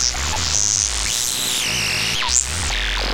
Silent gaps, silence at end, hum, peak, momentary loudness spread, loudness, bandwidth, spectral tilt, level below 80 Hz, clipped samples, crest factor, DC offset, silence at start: none; 0 s; none; 0 dBFS; 4 LU; -18 LUFS; 17 kHz; -0.5 dB/octave; -30 dBFS; under 0.1%; 20 dB; under 0.1%; 0 s